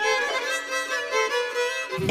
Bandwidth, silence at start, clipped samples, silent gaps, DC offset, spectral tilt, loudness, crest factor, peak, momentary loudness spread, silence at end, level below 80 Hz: 15.5 kHz; 0 s; under 0.1%; none; under 0.1%; -2.5 dB/octave; -25 LUFS; 16 dB; -10 dBFS; 3 LU; 0 s; -66 dBFS